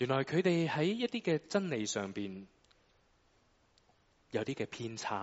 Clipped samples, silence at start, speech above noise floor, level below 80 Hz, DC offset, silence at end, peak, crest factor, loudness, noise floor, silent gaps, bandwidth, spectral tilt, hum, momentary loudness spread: under 0.1%; 0 s; 36 dB; -74 dBFS; under 0.1%; 0 s; -18 dBFS; 18 dB; -35 LUFS; -70 dBFS; none; 8 kHz; -5 dB/octave; none; 10 LU